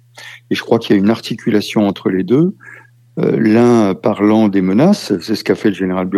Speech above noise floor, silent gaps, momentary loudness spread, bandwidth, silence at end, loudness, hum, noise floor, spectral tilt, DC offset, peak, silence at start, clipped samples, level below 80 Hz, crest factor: 24 dB; none; 8 LU; 13.5 kHz; 0 s; -14 LUFS; none; -37 dBFS; -7 dB/octave; under 0.1%; 0 dBFS; 0.15 s; under 0.1%; -60 dBFS; 14 dB